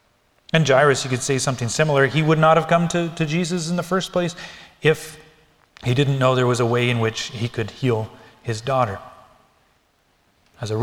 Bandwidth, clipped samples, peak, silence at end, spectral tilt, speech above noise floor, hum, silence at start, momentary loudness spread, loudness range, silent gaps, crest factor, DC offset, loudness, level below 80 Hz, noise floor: 15 kHz; under 0.1%; -2 dBFS; 0 s; -5 dB/octave; 43 dB; none; 0.55 s; 13 LU; 8 LU; none; 20 dB; under 0.1%; -20 LUFS; -54 dBFS; -63 dBFS